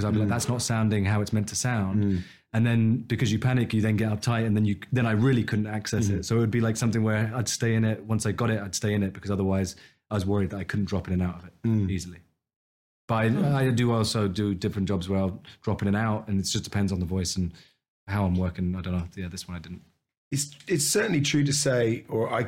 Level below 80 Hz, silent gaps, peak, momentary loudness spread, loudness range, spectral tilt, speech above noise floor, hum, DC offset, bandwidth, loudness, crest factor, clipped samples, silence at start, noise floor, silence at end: -52 dBFS; 12.56-13.08 s, 17.88-18.07 s, 20.17-20.31 s; -12 dBFS; 9 LU; 4 LU; -5.5 dB/octave; over 64 dB; none; under 0.1%; 16.5 kHz; -26 LUFS; 14 dB; under 0.1%; 0 s; under -90 dBFS; 0 s